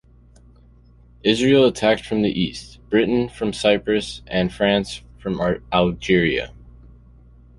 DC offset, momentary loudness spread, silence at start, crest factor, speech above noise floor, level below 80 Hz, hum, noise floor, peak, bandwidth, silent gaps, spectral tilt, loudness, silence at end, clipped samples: under 0.1%; 10 LU; 1.25 s; 20 dB; 30 dB; -44 dBFS; 60 Hz at -45 dBFS; -50 dBFS; -2 dBFS; 11.5 kHz; none; -5.5 dB/octave; -20 LUFS; 0.9 s; under 0.1%